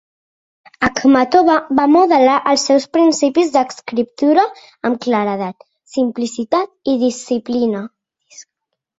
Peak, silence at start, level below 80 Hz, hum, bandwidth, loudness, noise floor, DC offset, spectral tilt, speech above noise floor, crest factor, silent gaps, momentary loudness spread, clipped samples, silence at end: 0 dBFS; 0.8 s; -52 dBFS; none; 8 kHz; -15 LUFS; -77 dBFS; under 0.1%; -4 dB/octave; 63 dB; 14 dB; none; 10 LU; under 0.1%; 0.55 s